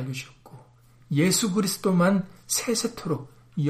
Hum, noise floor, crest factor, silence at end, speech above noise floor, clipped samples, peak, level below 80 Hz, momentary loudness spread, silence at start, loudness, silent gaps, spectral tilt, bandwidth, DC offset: none; -54 dBFS; 16 dB; 0 s; 30 dB; under 0.1%; -10 dBFS; -62 dBFS; 13 LU; 0 s; -25 LUFS; none; -4.5 dB/octave; 15.5 kHz; under 0.1%